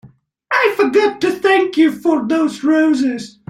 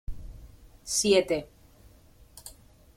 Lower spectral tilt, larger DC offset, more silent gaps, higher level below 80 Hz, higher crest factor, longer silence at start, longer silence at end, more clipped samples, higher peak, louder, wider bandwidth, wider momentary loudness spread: first, -4.5 dB/octave vs -3 dB/octave; neither; neither; second, -60 dBFS vs -46 dBFS; second, 14 dB vs 22 dB; first, 0.5 s vs 0.1 s; second, 0.2 s vs 0.45 s; neither; first, -2 dBFS vs -10 dBFS; first, -15 LUFS vs -25 LUFS; second, 14.5 kHz vs 16.5 kHz; second, 4 LU vs 25 LU